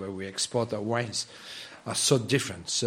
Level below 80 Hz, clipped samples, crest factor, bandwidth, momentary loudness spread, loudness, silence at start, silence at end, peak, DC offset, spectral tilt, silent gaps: -66 dBFS; under 0.1%; 22 dB; 16 kHz; 15 LU; -28 LUFS; 0 s; 0 s; -8 dBFS; under 0.1%; -3.5 dB/octave; none